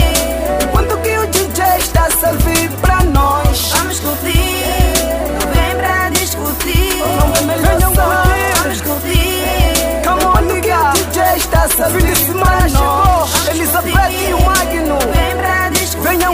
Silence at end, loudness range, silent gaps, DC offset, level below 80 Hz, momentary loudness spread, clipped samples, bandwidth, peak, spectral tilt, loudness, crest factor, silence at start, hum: 0 s; 2 LU; none; under 0.1%; -18 dBFS; 3 LU; under 0.1%; 16 kHz; 0 dBFS; -4 dB/octave; -13 LUFS; 12 dB; 0 s; none